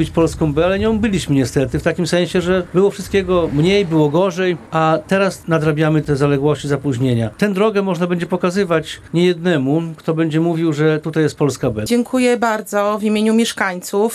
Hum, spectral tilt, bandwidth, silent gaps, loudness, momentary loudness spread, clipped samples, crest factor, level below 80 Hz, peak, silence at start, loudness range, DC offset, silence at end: none; -6 dB/octave; 13.5 kHz; none; -17 LUFS; 4 LU; under 0.1%; 14 dB; -40 dBFS; -2 dBFS; 0 s; 1 LU; under 0.1%; 0 s